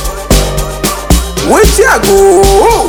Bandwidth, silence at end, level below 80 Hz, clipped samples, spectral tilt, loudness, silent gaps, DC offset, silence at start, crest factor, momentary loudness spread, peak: over 20 kHz; 0 s; -14 dBFS; 5%; -4 dB/octave; -8 LUFS; none; under 0.1%; 0 s; 8 dB; 9 LU; 0 dBFS